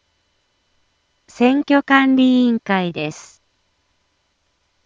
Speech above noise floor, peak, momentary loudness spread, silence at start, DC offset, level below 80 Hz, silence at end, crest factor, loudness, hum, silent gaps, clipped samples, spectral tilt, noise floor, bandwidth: 51 dB; 0 dBFS; 13 LU; 1.4 s; under 0.1%; -66 dBFS; 1.65 s; 18 dB; -16 LUFS; none; none; under 0.1%; -5.5 dB/octave; -67 dBFS; 7.6 kHz